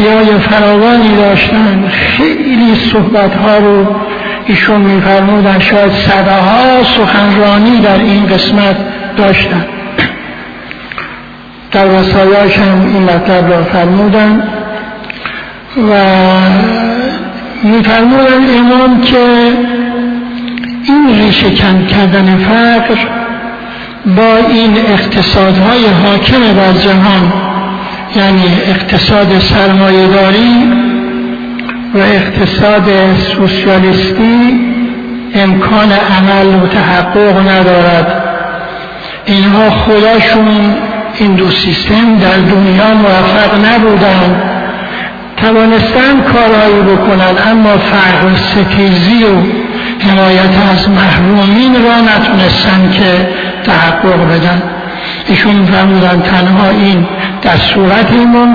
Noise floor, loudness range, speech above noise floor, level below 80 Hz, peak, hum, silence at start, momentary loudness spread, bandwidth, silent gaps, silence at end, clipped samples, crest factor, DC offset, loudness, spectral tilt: -29 dBFS; 3 LU; 23 dB; -30 dBFS; 0 dBFS; none; 0 s; 10 LU; 5.4 kHz; none; 0 s; 0.6%; 6 dB; under 0.1%; -7 LUFS; -7.5 dB/octave